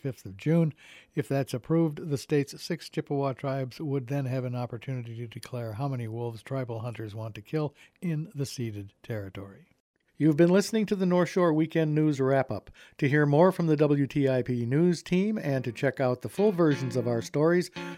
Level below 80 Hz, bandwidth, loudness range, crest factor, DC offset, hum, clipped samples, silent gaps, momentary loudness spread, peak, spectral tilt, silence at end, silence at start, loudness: -66 dBFS; 15.5 kHz; 10 LU; 18 dB; under 0.1%; none; under 0.1%; 9.80-9.94 s; 14 LU; -8 dBFS; -7 dB/octave; 0 s; 0.05 s; -28 LUFS